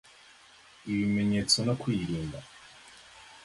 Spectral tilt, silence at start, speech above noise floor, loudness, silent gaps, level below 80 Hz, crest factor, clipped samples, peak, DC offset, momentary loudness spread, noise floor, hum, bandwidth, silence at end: -4.5 dB/octave; 0.85 s; 27 dB; -29 LUFS; none; -56 dBFS; 22 dB; under 0.1%; -10 dBFS; under 0.1%; 25 LU; -56 dBFS; none; 11.5 kHz; 0.05 s